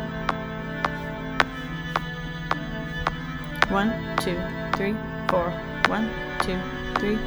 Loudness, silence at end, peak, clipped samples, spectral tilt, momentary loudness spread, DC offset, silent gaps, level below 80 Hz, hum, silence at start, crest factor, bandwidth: -27 LUFS; 0 s; 0 dBFS; under 0.1%; -5.5 dB/octave; 8 LU; under 0.1%; none; -40 dBFS; none; 0 s; 26 dB; over 20 kHz